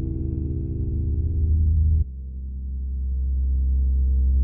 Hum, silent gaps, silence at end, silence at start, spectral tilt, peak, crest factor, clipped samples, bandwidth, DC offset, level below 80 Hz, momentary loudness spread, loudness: none; none; 0 s; 0 s; -16.5 dB/octave; -12 dBFS; 10 dB; under 0.1%; 0.7 kHz; under 0.1%; -22 dBFS; 10 LU; -25 LUFS